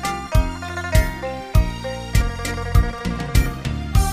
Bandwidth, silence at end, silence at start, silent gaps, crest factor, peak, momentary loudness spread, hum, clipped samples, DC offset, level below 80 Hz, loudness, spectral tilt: 15.5 kHz; 0 s; 0 s; none; 18 dB; -2 dBFS; 6 LU; none; under 0.1%; under 0.1%; -22 dBFS; -22 LUFS; -5.5 dB/octave